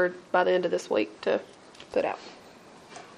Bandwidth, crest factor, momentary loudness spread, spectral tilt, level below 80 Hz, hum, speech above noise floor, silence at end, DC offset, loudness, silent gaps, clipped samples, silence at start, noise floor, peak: 11.5 kHz; 20 dB; 22 LU; -5 dB/octave; -72 dBFS; none; 23 dB; 0.1 s; under 0.1%; -28 LUFS; none; under 0.1%; 0 s; -51 dBFS; -10 dBFS